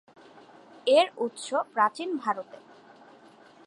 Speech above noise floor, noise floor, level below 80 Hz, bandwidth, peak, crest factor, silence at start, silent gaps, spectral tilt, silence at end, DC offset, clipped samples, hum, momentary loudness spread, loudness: 28 dB; -54 dBFS; -86 dBFS; 11.5 kHz; -10 dBFS; 20 dB; 0.85 s; none; -3 dB/octave; 1.25 s; under 0.1%; under 0.1%; none; 11 LU; -27 LUFS